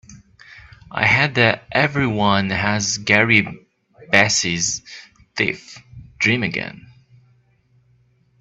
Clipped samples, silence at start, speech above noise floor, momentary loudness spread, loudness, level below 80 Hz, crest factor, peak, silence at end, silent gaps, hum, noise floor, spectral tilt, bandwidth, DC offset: under 0.1%; 0.1 s; 40 dB; 17 LU; -17 LUFS; -52 dBFS; 22 dB; 0 dBFS; 1.6 s; none; none; -59 dBFS; -3.5 dB/octave; 8.4 kHz; under 0.1%